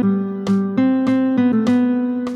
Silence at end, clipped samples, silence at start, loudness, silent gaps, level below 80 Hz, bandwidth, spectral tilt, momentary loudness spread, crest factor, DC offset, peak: 0 s; under 0.1%; 0 s; -17 LUFS; none; -58 dBFS; 8 kHz; -8 dB/octave; 4 LU; 10 dB; under 0.1%; -6 dBFS